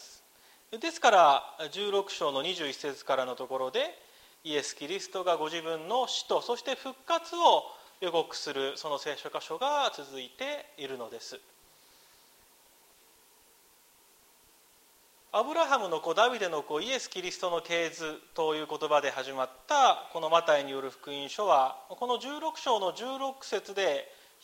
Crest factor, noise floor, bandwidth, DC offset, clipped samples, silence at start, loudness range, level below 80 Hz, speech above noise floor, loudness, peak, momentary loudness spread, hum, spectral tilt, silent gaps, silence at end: 22 dB; -62 dBFS; 16 kHz; under 0.1%; under 0.1%; 0 s; 8 LU; -78 dBFS; 32 dB; -30 LUFS; -8 dBFS; 13 LU; none; -2 dB/octave; none; 0.3 s